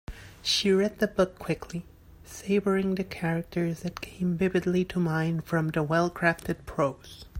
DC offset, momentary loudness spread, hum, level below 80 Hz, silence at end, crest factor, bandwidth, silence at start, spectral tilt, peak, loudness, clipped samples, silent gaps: under 0.1%; 11 LU; none; -52 dBFS; 0 s; 20 dB; 16 kHz; 0.1 s; -5.5 dB/octave; -8 dBFS; -28 LUFS; under 0.1%; none